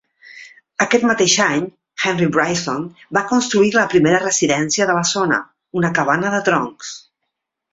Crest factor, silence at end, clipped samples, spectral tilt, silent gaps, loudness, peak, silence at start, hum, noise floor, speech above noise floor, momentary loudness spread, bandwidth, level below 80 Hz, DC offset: 18 dB; 0.75 s; under 0.1%; -3.5 dB/octave; none; -17 LUFS; 0 dBFS; 0.25 s; none; -77 dBFS; 60 dB; 12 LU; 8 kHz; -58 dBFS; under 0.1%